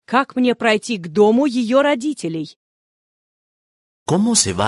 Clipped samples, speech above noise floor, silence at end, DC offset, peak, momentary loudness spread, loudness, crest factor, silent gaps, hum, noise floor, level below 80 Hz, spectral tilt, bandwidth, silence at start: under 0.1%; over 73 dB; 0 s; under 0.1%; -2 dBFS; 12 LU; -17 LUFS; 16 dB; 2.56-4.06 s; none; under -90 dBFS; -52 dBFS; -4 dB/octave; 11.5 kHz; 0.1 s